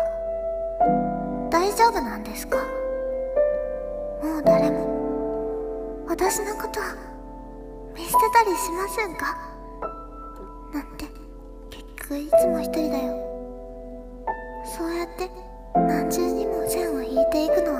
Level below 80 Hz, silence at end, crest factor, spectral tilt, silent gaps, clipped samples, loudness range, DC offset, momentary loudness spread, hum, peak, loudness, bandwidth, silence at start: -42 dBFS; 0 s; 20 dB; -4.5 dB/octave; none; under 0.1%; 5 LU; under 0.1%; 20 LU; none; -6 dBFS; -25 LUFS; 15.5 kHz; 0 s